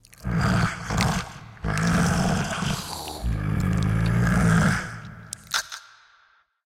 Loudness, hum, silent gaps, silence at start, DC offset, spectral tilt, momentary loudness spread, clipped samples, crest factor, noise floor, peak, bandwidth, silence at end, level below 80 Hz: -24 LUFS; none; none; 0.2 s; under 0.1%; -5 dB/octave; 16 LU; under 0.1%; 18 dB; -61 dBFS; -6 dBFS; 16 kHz; 0.85 s; -36 dBFS